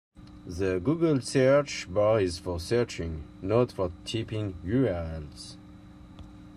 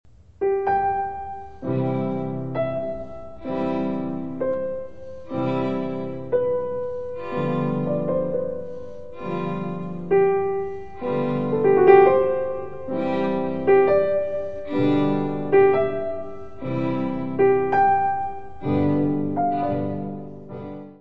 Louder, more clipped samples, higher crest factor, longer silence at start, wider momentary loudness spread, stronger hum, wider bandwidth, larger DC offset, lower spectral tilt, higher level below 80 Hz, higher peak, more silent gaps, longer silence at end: second, -28 LUFS vs -23 LUFS; neither; about the same, 16 dB vs 20 dB; first, 0.2 s vs 0 s; first, 20 LU vs 15 LU; neither; first, 13 kHz vs 5 kHz; second, under 0.1% vs 1%; second, -6 dB/octave vs -10 dB/octave; about the same, -52 dBFS vs -52 dBFS; second, -12 dBFS vs -2 dBFS; neither; about the same, 0 s vs 0 s